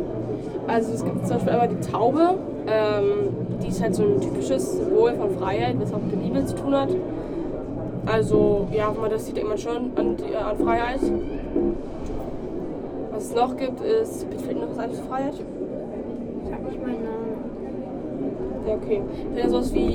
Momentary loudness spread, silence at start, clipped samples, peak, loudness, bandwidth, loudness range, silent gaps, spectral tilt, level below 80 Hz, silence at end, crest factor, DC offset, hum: 11 LU; 0 s; under 0.1%; -6 dBFS; -25 LUFS; 16 kHz; 7 LU; none; -7 dB/octave; -40 dBFS; 0 s; 18 dB; under 0.1%; none